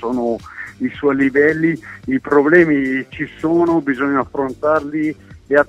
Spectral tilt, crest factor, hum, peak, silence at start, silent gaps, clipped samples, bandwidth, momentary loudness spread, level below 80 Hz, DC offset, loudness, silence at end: -8 dB/octave; 16 dB; none; 0 dBFS; 0 s; none; under 0.1%; 8.8 kHz; 13 LU; -50 dBFS; under 0.1%; -17 LUFS; 0.05 s